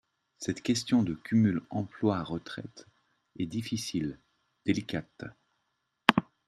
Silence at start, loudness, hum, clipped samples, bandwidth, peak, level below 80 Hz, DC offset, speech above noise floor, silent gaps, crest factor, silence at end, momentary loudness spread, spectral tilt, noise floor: 0.4 s; -31 LUFS; none; under 0.1%; 13.5 kHz; 0 dBFS; -64 dBFS; under 0.1%; 49 dB; none; 32 dB; 0.25 s; 16 LU; -5 dB/octave; -79 dBFS